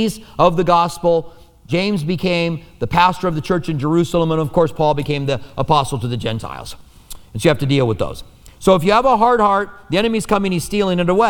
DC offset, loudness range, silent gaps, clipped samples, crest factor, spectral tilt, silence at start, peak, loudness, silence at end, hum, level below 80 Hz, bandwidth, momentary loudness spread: under 0.1%; 4 LU; none; under 0.1%; 16 dB; -6 dB/octave; 0 s; 0 dBFS; -17 LUFS; 0 s; none; -38 dBFS; 19 kHz; 10 LU